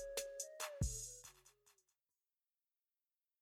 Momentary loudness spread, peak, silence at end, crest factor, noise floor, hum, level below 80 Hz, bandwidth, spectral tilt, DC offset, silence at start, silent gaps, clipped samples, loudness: 12 LU; -28 dBFS; 1.7 s; 22 dB; under -90 dBFS; none; -56 dBFS; 16 kHz; -3.5 dB/octave; under 0.1%; 0 s; none; under 0.1%; -46 LUFS